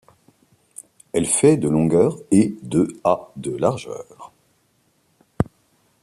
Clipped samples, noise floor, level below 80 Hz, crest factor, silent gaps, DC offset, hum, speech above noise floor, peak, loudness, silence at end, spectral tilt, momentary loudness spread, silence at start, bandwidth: under 0.1%; -64 dBFS; -52 dBFS; 20 dB; none; under 0.1%; none; 45 dB; -2 dBFS; -20 LUFS; 0.6 s; -6 dB/octave; 20 LU; 1.15 s; 14 kHz